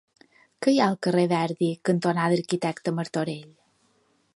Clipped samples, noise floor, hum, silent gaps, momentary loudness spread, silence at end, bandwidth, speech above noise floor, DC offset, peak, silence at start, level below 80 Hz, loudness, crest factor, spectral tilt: under 0.1%; -67 dBFS; none; none; 7 LU; 0.9 s; 11.5 kHz; 42 dB; under 0.1%; -8 dBFS; 0.6 s; -72 dBFS; -25 LUFS; 18 dB; -6 dB/octave